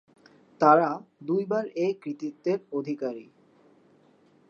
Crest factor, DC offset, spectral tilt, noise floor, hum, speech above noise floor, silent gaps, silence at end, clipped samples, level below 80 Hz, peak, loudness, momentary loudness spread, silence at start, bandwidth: 22 dB; under 0.1%; -7.5 dB/octave; -61 dBFS; none; 35 dB; none; 1.25 s; under 0.1%; -82 dBFS; -6 dBFS; -27 LUFS; 15 LU; 0.6 s; 7 kHz